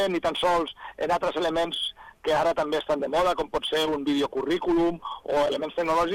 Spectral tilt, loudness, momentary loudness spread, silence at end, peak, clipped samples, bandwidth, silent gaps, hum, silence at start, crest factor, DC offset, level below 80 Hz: -4.5 dB/octave; -26 LUFS; 5 LU; 0 s; -12 dBFS; under 0.1%; 16.5 kHz; none; none; 0 s; 12 dB; under 0.1%; -52 dBFS